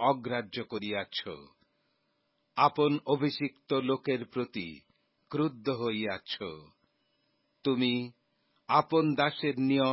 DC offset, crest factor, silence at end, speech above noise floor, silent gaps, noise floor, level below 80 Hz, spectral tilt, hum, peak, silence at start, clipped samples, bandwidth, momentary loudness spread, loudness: under 0.1%; 22 dB; 0 s; 46 dB; none; -76 dBFS; -72 dBFS; -9.5 dB/octave; none; -10 dBFS; 0 s; under 0.1%; 5.8 kHz; 13 LU; -31 LUFS